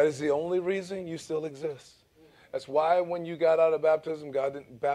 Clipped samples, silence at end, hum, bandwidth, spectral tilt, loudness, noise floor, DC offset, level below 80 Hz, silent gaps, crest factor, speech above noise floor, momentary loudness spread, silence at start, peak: under 0.1%; 0 s; none; 12 kHz; -6 dB/octave; -29 LUFS; -59 dBFS; under 0.1%; -72 dBFS; none; 16 dB; 31 dB; 14 LU; 0 s; -12 dBFS